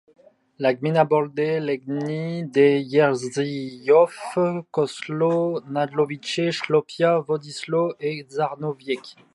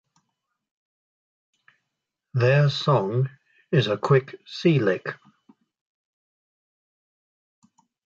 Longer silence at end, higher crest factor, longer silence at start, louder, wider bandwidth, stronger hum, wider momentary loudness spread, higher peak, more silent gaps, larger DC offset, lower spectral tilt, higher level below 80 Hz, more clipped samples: second, 0.25 s vs 3.05 s; about the same, 18 dB vs 20 dB; second, 0.6 s vs 2.35 s; about the same, -23 LUFS vs -23 LUFS; first, 11.5 kHz vs 7.4 kHz; neither; about the same, 10 LU vs 12 LU; about the same, -4 dBFS vs -6 dBFS; neither; neither; second, -6 dB/octave vs -7.5 dB/octave; second, -74 dBFS vs -66 dBFS; neither